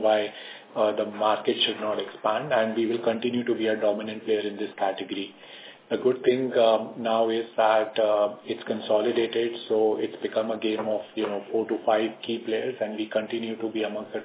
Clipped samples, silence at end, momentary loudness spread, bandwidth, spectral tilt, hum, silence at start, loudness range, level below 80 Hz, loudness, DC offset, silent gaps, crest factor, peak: under 0.1%; 0 s; 9 LU; 4 kHz; -8.5 dB/octave; none; 0 s; 4 LU; -78 dBFS; -26 LUFS; under 0.1%; none; 18 dB; -8 dBFS